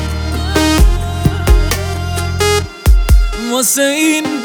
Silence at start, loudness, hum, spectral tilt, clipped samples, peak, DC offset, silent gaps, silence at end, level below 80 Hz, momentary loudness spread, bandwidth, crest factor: 0 s; -13 LUFS; none; -4.5 dB/octave; under 0.1%; 0 dBFS; under 0.1%; none; 0 s; -14 dBFS; 7 LU; over 20 kHz; 12 dB